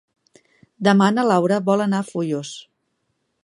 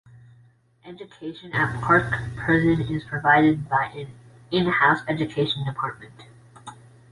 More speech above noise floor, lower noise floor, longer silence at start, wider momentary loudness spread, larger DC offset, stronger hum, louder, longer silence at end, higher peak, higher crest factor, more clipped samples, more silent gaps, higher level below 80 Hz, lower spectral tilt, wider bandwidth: first, 54 dB vs 34 dB; first, -72 dBFS vs -57 dBFS; about the same, 0.8 s vs 0.85 s; second, 12 LU vs 23 LU; neither; neither; first, -19 LUFS vs -22 LUFS; first, 0.85 s vs 0.35 s; about the same, -2 dBFS vs -4 dBFS; about the same, 18 dB vs 20 dB; neither; neither; second, -70 dBFS vs -50 dBFS; about the same, -6 dB/octave vs -7 dB/octave; about the same, 11.5 kHz vs 11.5 kHz